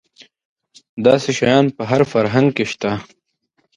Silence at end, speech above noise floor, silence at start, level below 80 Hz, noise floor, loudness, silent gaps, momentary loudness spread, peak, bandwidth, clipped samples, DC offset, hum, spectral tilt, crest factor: 0.75 s; 51 dB; 0.95 s; -54 dBFS; -67 dBFS; -17 LUFS; none; 8 LU; 0 dBFS; 10.5 kHz; under 0.1%; under 0.1%; none; -6 dB/octave; 18 dB